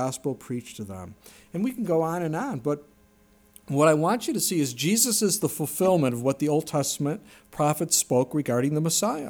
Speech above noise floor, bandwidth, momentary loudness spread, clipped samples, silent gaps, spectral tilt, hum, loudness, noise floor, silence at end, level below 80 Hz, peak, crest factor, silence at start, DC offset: 34 dB; over 20 kHz; 14 LU; under 0.1%; none; -4.5 dB/octave; none; -25 LUFS; -59 dBFS; 0 s; -64 dBFS; -8 dBFS; 18 dB; 0 s; under 0.1%